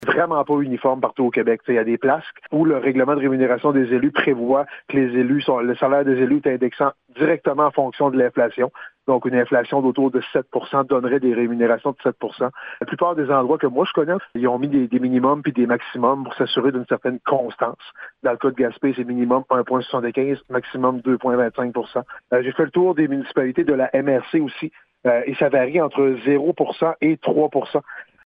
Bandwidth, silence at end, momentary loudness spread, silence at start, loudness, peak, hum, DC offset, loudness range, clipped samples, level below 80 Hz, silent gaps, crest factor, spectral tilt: 5 kHz; 0.2 s; 6 LU; 0 s; -20 LUFS; -4 dBFS; none; under 0.1%; 3 LU; under 0.1%; -64 dBFS; none; 16 dB; -9.5 dB/octave